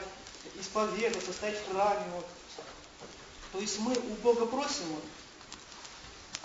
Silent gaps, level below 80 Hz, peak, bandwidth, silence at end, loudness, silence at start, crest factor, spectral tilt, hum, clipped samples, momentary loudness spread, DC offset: none; -62 dBFS; -14 dBFS; 8 kHz; 0 s; -33 LUFS; 0 s; 22 dB; -3 dB/octave; none; under 0.1%; 18 LU; under 0.1%